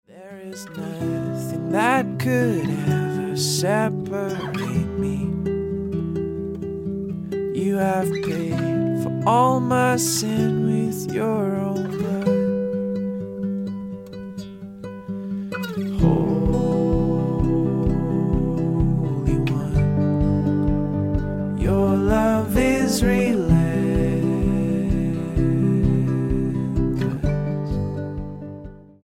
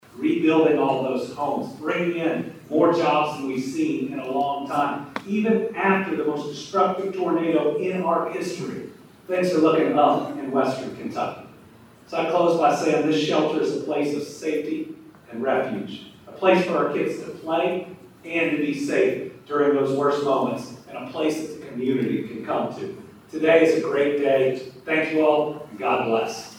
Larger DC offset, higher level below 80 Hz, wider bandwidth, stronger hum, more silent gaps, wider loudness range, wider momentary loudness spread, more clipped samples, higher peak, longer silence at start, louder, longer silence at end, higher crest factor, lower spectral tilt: neither; first, -34 dBFS vs -68 dBFS; about the same, 16.5 kHz vs 16 kHz; neither; neither; first, 6 LU vs 3 LU; second, 10 LU vs 13 LU; neither; about the same, -4 dBFS vs -4 dBFS; about the same, 0.15 s vs 0.15 s; about the same, -22 LUFS vs -23 LUFS; first, 0.2 s vs 0 s; about the same, 18 dB vs 18 dB; about the same, -6.5 dB/octave vs -6 dB/octave